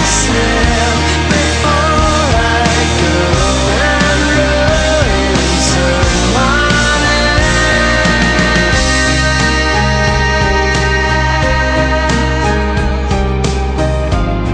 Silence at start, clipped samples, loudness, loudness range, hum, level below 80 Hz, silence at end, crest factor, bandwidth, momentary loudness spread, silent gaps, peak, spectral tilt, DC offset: 0 s; under 0.1%; -11 LUFS; 2 LU; none; -18 dBFS; 0 s; 10 dB; 10.5 kHz; 4 LU; none; 0 dBFS; -4 dB/octave; under 0.1%